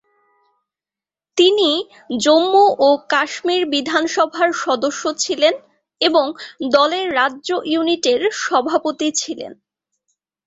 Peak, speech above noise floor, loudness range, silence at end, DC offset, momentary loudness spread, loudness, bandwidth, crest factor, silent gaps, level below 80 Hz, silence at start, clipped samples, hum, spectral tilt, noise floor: -2 dBFS; 73 dB; 3 LU; 0.95 s; under 0.1%; 10 LU; -17 LUFS; 8 kHz; 16 dB; none; -66 dBFS; 1.35 s; under 0.1%; none; -1.5 dB/octave; -90 dBFS